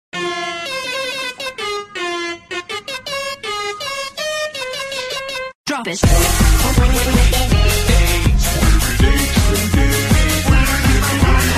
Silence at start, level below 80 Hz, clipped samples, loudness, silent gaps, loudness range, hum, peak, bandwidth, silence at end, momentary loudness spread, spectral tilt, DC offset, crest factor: 0.15 s; -18 dBFS; under 0.1%; -17 LUFS; 5.55-5.64 s; 8 LU; none; 0 dBFS; 15.5 kHz; 0 s; 10 LU; -4 dB/octave; under 0.1%; 14 dB